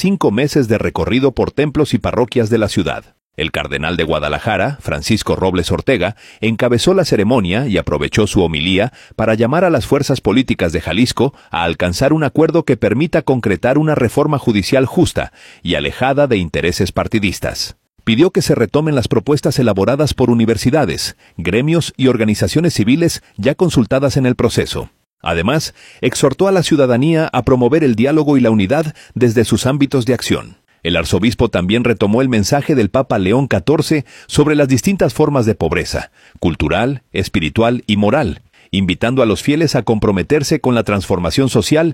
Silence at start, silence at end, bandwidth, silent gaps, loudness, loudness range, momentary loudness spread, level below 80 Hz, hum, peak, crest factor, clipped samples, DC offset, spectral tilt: 0 s; 0 s; 16.5 kHz; 3.22-3.30 s, 25.07-25.18 s; -15 LUFS; 3 LU; 7 LU; -36 dBFS; none; 0 dBFS; 14 dB; under 0.1%; under 0.1%; -6 dB/octave